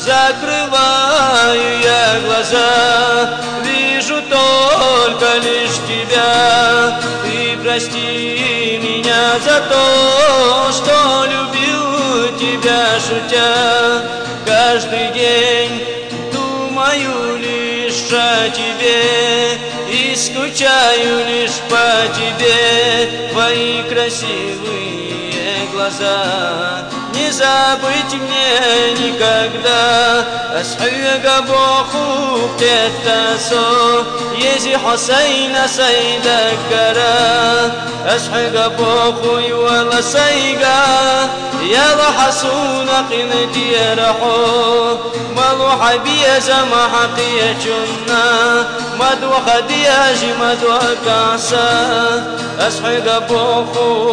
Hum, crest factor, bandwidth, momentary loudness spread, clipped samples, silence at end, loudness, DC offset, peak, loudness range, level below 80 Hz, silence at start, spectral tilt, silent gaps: none; 10 dB; 10 kHz; 7 LU; under 0.1%; 0 s; -12 LUFS; under 0.1%; -4 dBFS; 3 LU; -48 dBFS; 0 s; -2.5 dB/octave; none